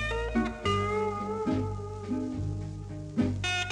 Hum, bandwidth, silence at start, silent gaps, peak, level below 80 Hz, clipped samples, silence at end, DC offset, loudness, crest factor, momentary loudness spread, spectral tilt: none; 11 kHz; 0 s; none; -16 dBFS; -44 dBFS; under 0.1%; 0 s; under 0.1%; -31 LUFS; 16 dB; 9 LU; -5.5 dB/octave